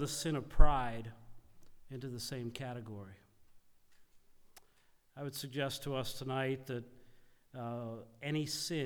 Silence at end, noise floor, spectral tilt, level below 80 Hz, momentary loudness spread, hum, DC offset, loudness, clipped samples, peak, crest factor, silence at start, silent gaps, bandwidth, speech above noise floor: 0 s; -68 dBFS; -4.5 dB/octave; -40 dBFS; 17 LU; none; under 0.1%; -39 LUFS; under 0.1%; -10 dBFS; 26 dB; 0 s; none; 16 kHz; 35 dB